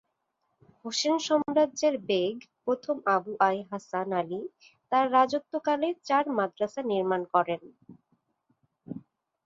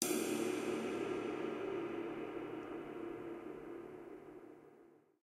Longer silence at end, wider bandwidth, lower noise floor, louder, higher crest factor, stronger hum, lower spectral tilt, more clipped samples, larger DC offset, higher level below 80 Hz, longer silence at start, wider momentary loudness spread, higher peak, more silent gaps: first, 0.45 s vs 0.25 s; second, 7.8 kHz vs 16 kHz; first, -78 dBFS vs -65 dBFS; first, -28 LUFS vs -42 LUFS; second, 20 dB vs 28 dB; neither; about the same, -4 dB/octave vs -3.5 dB/octave; neither; neither; about the same, -76 dBFS vs -76 dBFS; first, 0.85 s vs 0 s; second, 12 LU vs 16 LU; first, -8 dBFS vs -14 dBFS; neither